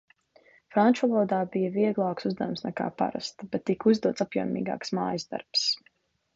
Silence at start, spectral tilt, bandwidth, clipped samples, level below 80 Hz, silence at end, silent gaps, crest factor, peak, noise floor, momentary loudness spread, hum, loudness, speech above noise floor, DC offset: 0.7 s; -5.5 dB/octave; 7.8 kHz; under 0.1%; -70 dBFS; 0.6 s; none; 18 dB; -10 dBFS; -60 dBFS; 9 LU; none; -27 LUFS; 33 dB; under 0.1%